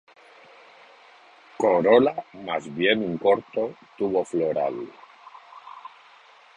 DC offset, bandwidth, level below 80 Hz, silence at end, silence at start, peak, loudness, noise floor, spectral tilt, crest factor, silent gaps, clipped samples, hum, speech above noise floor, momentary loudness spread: under 0.1%; 9.4 kHz; -66 dBFS; 0.7 s; 1.6 s; -4 dBFS; -23 LUFS; -52 dBFS; -6 dB/octave; 22 dB; none; under 0.1%; none; 29 dB; 25 LU